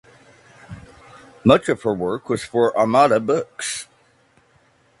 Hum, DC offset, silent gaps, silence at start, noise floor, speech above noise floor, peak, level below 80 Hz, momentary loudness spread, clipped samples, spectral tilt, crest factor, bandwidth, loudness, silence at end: none; under 0.1%; none; 0.7 s; -58 dBFS; 40 dB; 0 dBFS; -54 dBFS; 25 LU; under 0.1%; -5 dB/octave; 22 dB; 11.5 kHz; -19 LUFS; 1.15 s